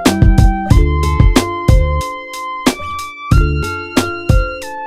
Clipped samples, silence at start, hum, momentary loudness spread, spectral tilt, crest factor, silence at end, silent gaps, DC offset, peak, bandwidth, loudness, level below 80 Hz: under 0.1%; 0 s; none; 11 LU; -6 dB/octave; 12 dB; 0 s; none; under 0.1%; 0 dBFS; 15 kHz; -15 LUFS; -16 dBFS